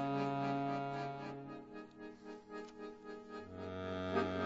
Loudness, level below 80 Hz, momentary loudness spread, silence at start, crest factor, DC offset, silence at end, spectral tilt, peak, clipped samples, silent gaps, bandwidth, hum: -43 LUFS; -74 dBFS; 14 LU; 0 s; 22 dB; under 0.1%; 0 s; -5.5 dB/octave; -20 dBFS; under 0.1%; none; 7.6 kHz; 50 Hz at -80 dBFS